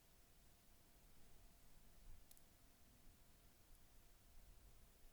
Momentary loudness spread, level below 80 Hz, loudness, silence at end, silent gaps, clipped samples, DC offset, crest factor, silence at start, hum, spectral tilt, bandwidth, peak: 2 LU; -68 dBFS; -69 LUFS; 0 s; none; under 0.1%; under 0.1%; 26 dB; 0 s; none; -3.5 dB/octave; over 20 kHz; -40 dBFS